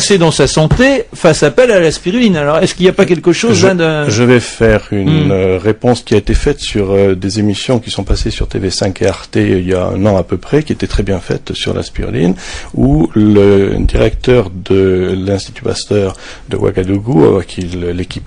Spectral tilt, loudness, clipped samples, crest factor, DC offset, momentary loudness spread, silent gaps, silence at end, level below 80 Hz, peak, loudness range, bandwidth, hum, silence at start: -5.5 dB/octave; -12 LUFS; 0.3%; 10 dB; under 0.1%; 8 LU; none; 0 s; -24 dBFS; 0 dBFS; 4 LU; 11 kHz; none; 0 s